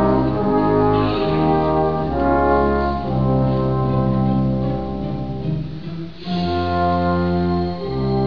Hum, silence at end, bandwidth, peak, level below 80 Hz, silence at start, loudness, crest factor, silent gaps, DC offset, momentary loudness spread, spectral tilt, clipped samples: none; 0 s; 5.4 kHz; -4 dBFS; -32 dBFS; 0 s; -19 LUFS; 14 dB; none; 2%; 9 LU; -10 dB/octave; under 0.1%